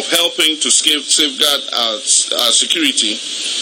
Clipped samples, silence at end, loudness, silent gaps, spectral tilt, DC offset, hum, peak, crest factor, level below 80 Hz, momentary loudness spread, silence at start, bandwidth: under 0.1%; 0 s; -12 LUFS; none; 1.5 dB/octave; under 0.1%; none; 0 dBFS; 16 dB; -72 dBFS; 5 LU; 0 s; over 20 kHz